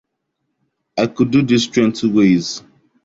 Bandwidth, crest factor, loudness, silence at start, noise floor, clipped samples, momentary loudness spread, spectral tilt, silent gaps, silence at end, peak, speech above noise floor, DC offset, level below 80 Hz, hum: 7.8 kHz; 16 dB; -16 LUFS; 0.95 s; -73 dBFS; under 0.1%; 13 LU; -5.5 dB/octave; none; 0.45 s; -2 dBFS; 58 dB; under 0.1%; -52 dBFS; none